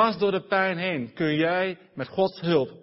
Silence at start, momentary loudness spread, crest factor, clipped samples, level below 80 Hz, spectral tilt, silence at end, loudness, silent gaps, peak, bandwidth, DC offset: 0 s; 7 LU; 18 dB; under 0.1%; -66 dBFS; -9.5 dB/octave; 0.05 s; -25 LUFS; none; -8 dBFS; 5.8 kHz; under 0.1%